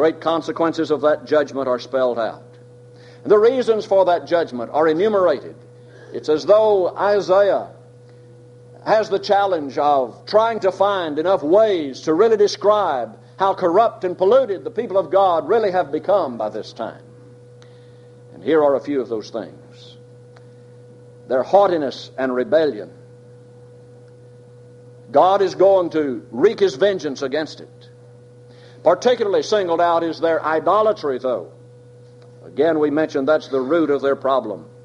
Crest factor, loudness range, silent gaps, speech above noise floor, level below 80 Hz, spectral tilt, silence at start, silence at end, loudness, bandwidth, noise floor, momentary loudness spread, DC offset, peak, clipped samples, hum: 18 dB; 6 LU; none; 26 dB; -66 dBFS; -5.5 dB/octave; 0 s; 0.2 s; -18 LUFS; 9.4 kHz; -44 dBFS; 11 LU; under 0.1%; -2 dBFS; under 0.1%; none